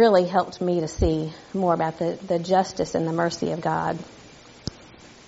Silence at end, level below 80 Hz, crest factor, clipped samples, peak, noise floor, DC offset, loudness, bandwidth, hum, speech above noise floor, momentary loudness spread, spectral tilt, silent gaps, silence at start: 0.4 s; -42 dBFS; 18 dB; under 0.1%; -6 dBFS; -47 dBFS; under 0.1%; -24 LUFS; 8 kHz; none; 24 dB; 14 LU; -5.5 dB/octave; none; 0 s